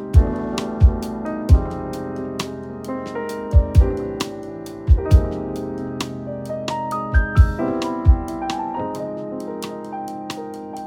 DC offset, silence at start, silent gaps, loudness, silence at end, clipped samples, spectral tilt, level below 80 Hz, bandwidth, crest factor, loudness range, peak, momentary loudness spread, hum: under 0.1%; 0 s; none; -22 LUFS; 0 s; under 0.1%; -7 dB/octave; -22 dBFS; 12.5 kHz; 18 dB; 2 LU; -2 dBFS; 12 LU; none